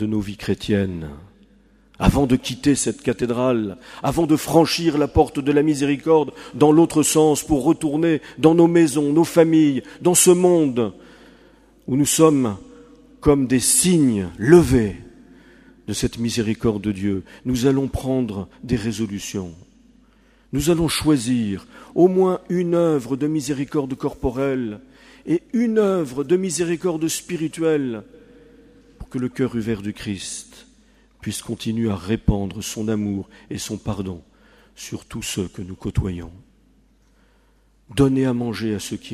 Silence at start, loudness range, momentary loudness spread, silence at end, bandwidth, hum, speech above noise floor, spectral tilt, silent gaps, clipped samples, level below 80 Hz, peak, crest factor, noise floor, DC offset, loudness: 0 s; 11 LU; 14 LU; 0 s; 15.5 kHz; none; 38 dB; -5 dB/octave; none; under 0.1%; -40 dBFS; 0 dBFS; 20 dB; -57 dBFS; under 0.1%; -20 LUFS